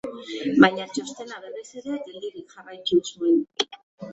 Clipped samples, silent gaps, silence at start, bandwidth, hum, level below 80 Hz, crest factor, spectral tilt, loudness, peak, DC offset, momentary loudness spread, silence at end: under 0.1%; 3.83-3.98 s; 0.05 s; 8.2 kHz; none; -64 dBFS; 24 dB; -4.5 dB/octave; -23 LUFS; 0 dBFS; under 0.1%; 20 LU; 0 s